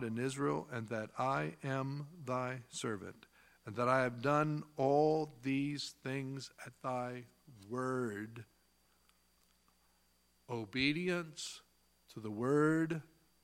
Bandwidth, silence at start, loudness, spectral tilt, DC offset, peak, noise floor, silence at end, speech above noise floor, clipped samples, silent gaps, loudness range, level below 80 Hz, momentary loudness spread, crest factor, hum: 16.5 kHz; 0 s; -37 LUFS; -5.5 dB/octave; under 0.1%; -16 dBFS; -74 dBFS; 0.4 s; 37 dB; under 0.1%; none; 9 LU; -74 dBFS; 14 LU; 22 dB; none